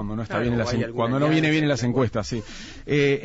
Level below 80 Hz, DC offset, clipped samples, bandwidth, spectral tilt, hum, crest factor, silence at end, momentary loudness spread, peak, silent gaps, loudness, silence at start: -44 dBFS; under 0.1%; under 0.1%; 8 kHz; -6 dB/octave; none; 12 dB; 0 s; 11 LU; -10 dBFS; none; -23 LUFS; 0 s